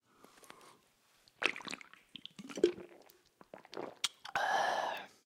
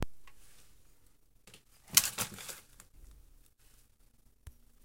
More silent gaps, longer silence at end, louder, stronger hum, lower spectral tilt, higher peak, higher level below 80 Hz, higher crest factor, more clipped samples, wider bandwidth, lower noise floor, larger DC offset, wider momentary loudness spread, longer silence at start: neither; second, 0.2 s vs 0.35 s; second, -37 LUFS vs -31 LUFS; neither; first, -2 dB/octave vs -0.5 dB/octave; second, -10 dBFS vs -4 dBFS; second, -78 dBFS vs -58 dBFS; second, 30 dB vs 36 dB; neither; about the same, 16.5 kHz vs 17 kHz; first, -71 dBFS vs -67 dBFS; neither; first, 24 LU vs 19 LU; first, 0.5 s vs 0 s